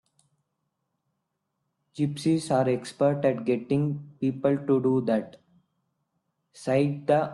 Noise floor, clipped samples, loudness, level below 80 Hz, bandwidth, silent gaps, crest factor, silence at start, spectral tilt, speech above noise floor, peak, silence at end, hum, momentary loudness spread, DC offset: -80 dBFS; under 0.1%; -26 LUFS; -68 dBFS; 12 kHz; none; 16 dB; 1.95 s; -7.5 dB/octave; 55 dB; -10 dBFS; 0 s; none; 7 LU; under 0.1%